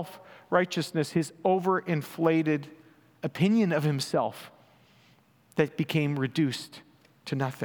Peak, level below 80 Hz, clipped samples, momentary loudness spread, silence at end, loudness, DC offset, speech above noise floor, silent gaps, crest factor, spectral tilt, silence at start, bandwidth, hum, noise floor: -8 dBFS; -76 dBFS; under 0.1%; 13 LU; 0 s; -28 LUFS; under 0.1%; 34 dB; none; 20 dB; -6.5 dB/octave; 0 s; over 20 kHz; none; -62 dBFS